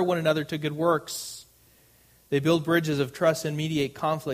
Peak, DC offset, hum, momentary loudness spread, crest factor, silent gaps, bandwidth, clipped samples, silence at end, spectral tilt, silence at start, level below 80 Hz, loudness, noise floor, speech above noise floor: -8 dBFS; under 0.1%; none; 9 LU; 18 dB; none; 15.5 kHz; under 0.1%; 0 s; -5.5 dB/octave; 0 s; -62 dBFS; -26 LUFS; -59 dBFS; 33 dB